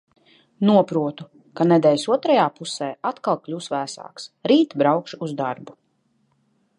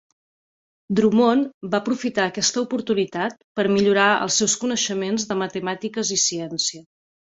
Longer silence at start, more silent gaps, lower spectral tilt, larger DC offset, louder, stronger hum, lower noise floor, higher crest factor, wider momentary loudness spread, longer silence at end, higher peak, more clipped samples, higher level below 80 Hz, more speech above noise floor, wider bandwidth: second, 0.6 s vs 0.9 s; second, none vs 1.54-1.61 s, 3.44-3.55 s; first, -6 dB/octave vs -3 dB/octave; neither; about the same, -21 LUFS vs -21 LUFS; neither; second, -67 dBFS vs under -90 dBFS; about the same, 20 dB vs 16 dB; first, 15 LU vs 8 LU; first, 1.05 s vs 0.6 s; first, -2 dBFS vs -6 dBFS; neither; second, -74 dBFS vs -62 dBFS; second, 46 dB vs over 69 dB; first, 11 kHz vs 8 kHz